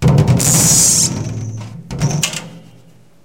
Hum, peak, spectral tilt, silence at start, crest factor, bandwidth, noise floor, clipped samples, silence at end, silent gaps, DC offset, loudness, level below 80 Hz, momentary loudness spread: none; 0 dBFS; -3.5 dB/octave; 0 s; 16 dB; 17 kHz; -46 dBFS; under 0.1%; 0.65 s; none; under 0.1%; -12 LUFS; -34 dBFS; 19 LU